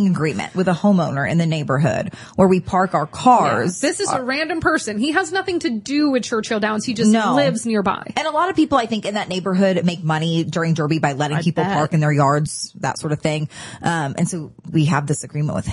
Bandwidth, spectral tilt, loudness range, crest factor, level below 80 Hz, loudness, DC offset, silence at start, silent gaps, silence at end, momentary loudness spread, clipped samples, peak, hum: 11.5 kHz; -5.5 dB/octave; 3 LU; 16 dB; -52 dBFS; -19 LUFS; under 0.1%; 0 s; none; 0 s; 7 LU; under 0.1%; -2 dBFS; none